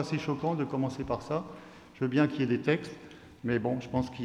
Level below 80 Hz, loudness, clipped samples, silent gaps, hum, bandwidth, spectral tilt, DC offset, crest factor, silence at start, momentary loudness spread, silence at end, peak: -58 dBFS; -31 LUFS; under 0.1%; none; none; 11 kHz; -7.5 dB/octave; under 0.1%; 18 dB; 0 s; 18 LU; 0 s; -14 dBFS